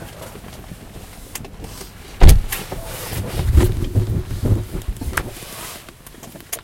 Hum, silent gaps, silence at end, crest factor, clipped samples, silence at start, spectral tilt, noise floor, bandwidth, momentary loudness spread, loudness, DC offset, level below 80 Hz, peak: none; none; 0.05 s; 18 dB; 0.3%; 0 s; -5.5 dB/octave; -40 dBFS; 17 kHz; 22 LU; -21 LUFS; under 0.1%; -22 dBFS; 0 dBFS